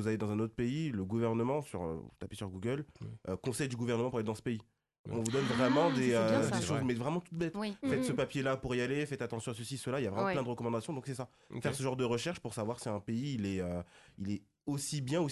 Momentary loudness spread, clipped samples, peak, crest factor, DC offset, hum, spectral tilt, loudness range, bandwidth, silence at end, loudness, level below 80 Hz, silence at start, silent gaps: 11 LU; under 0.1%; -18 dBFS; 18 dB; under 0.1%; none; -5.5 dB/octave; 5 LU; 12 kHz; 0 s; -35 LUFS; -60 dBFS; 0 s; 4.99-5.04 s